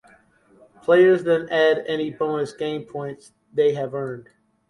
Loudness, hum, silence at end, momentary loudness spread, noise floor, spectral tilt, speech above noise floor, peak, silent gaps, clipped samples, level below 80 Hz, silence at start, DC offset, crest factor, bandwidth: -21 LUFS; none; 0.45 s; 16 LU; -55 dBFS; -6.5 dB/octave; 35 dB; -4 dBFS; none; under 0.1%; -66 dBFS; 0.9 s; under 0.1%; 18 dB; 11.5 kHz